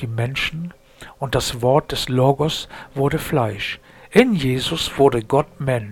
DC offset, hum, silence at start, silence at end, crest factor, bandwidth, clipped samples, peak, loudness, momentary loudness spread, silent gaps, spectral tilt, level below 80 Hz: under 0.1%; none; 0 s; 0 s; 20 dB; 18 kHz; under 0.1%; 0 dBFS; -20 LUFS; 11 LU; none; -5.5 dB/octave; -42 dBFS